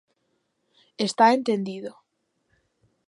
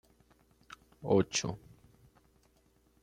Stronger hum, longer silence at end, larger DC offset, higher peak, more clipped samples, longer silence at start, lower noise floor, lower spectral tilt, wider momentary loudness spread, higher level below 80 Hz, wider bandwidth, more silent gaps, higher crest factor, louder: neither; second, 1.2 s vs 1.45 s; neither; first, -6 dBFS vs -14 dBFS; neither; about the same, 1 s vs 1 s; first, -74 dBFS vs -69 dBFS; about the same, -4.5 dB/octave vs -4.5 dB/octave; second, 18 LU vs 26 LU; second, -78 dBFS vs -66 dBFS; second, 11.5 kHz vs 13.5 kHz; neither; about the same, 22 dB vs 24 dB; first, -22 LUFS vs -32 LUFS